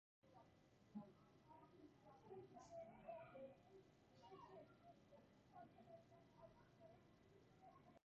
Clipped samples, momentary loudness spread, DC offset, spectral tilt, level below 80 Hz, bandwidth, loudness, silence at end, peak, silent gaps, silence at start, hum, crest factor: under 0.1%; 10 LU; under 0.1%; -6 dB/octave; -86 dBFS; 7 kHz; -64 LUFS; 0.05 s; -46 dBFS; none; 0.25 s; none; 20 dB